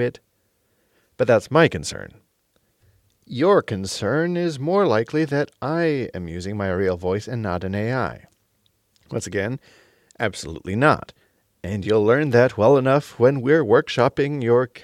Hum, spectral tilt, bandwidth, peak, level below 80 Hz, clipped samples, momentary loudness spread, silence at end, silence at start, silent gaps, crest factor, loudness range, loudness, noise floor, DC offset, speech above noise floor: none; -6.5 dB/octave; 13 kHz; -4 dBFS; -54 dBFS; under 0.1%; 13 LU; 0.05 s; 0 s; none; 18 dB; 8 LU; -21 LUFS; -67 dBFS; under 0.1%; 47 dB